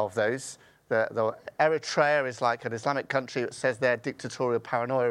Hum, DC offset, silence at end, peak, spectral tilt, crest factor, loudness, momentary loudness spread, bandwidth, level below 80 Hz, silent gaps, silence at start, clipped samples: none; under 0.1%; 0 s; -8 dBFS; -4.5 dB/octave; 20 dB; -28 LUFS; 7 LU; 12.5 kHz; -72 dBFS; none; 0 s; under 0.1%